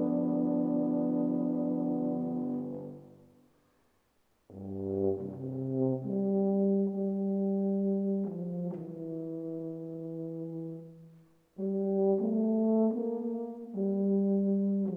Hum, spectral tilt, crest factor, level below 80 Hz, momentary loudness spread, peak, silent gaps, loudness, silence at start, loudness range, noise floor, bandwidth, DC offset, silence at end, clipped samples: none; -13 dB/octave; 14 dB; -78 dBFS; 12 LU; -18 dBFS; none; -32 LUFS; 0 s; 8 LU; -72 dBFS; 1.8 kHz; under 0.1%; 0 s; under 0.1%